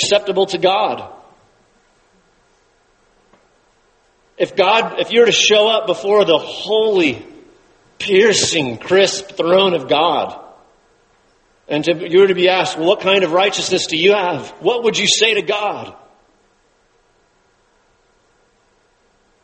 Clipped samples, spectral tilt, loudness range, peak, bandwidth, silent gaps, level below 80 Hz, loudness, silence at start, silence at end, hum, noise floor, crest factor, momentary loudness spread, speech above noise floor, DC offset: under 0.1%; -3 dB/octave; 8 LU; 0 dBFS; 8.8 kHz; none; -60 dBFS; -15 LUFS; 0 s; 3.5 s; none; -58 dBFS; 18 dB; 10 LU; 43 dB; under 0.1%